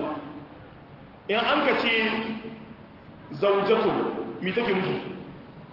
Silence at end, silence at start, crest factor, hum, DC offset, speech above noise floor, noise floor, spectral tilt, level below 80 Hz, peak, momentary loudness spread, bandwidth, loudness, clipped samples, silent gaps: 0 s; 0 s; 18 dB; none; under 0.1%; 22 dB; -47 dBFS; -7 dB/octave; -60 dBFS; -10 dBFS; 23 LU; 5.8 kHz; -25 LUFS; under 0.1%; none